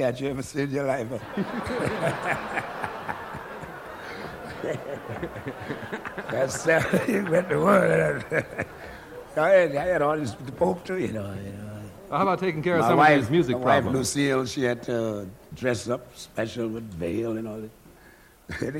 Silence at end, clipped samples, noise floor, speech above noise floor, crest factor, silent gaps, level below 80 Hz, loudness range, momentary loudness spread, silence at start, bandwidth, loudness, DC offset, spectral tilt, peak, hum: 0 s; under 0.1%; -53 dBFS; 28 dB; 20 dB; none; -54 dBFS; 10 LU; 17 LU; 0 s; 16.5 kHz; -25 LUFS; under 0.1%; -5.5 dB/octave; -6 dBFS; none